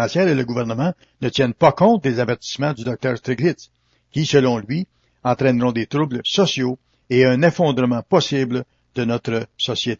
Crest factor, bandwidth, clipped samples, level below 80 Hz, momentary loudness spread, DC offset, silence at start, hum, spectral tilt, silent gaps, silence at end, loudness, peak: 18 dB; 7.6 kHz; under 0.1%; -56 dBFS; 10 LU; under 0.1%; 0 s; none; -6 dB/octave; none; 0.05 s; -19 LUFS; -2 dBFS